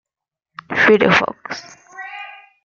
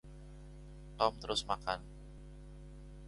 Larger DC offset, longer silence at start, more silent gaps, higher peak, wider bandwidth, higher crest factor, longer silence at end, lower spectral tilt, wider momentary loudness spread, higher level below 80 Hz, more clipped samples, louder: neither; first, 0.7 s vs 0.05 s; neither; first, -2 dBFS vs -14 dBFS; second, 7.2 kHz vs 11.5 kHz; second, 18 dB vs 26 dB; first, 0.3 s vs 0 s; first, -5 dB/octave vs -3.5 dB/octave; about the same, 21 LU vs 19 LU; about the same, -56 dBFS vs -54 dBFS; neither; first, -14 LUFS vs -37 LUFS